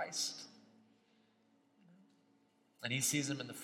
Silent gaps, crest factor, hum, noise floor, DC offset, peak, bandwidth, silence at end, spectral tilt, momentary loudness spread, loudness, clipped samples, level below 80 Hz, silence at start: none; 24 dB; none; -73 dBFS; under 0.1%; -20 dBFS; 16 kHz; 0 s; -2.5 dB/octave; 16 LU; -37 LUFS; under 0.1%; -86 dBFS; 0 s